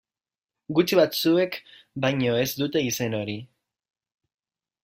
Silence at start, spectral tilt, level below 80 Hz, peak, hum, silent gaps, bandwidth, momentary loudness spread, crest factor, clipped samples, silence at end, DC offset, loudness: 0.7 s; -5 dB/octave; -64 dBFS; -6 dBFS; none; none; 16 kHz; 13 LU; 20 dB; under 0.1%; 1.4 s; under 0.1%; -24 LUFS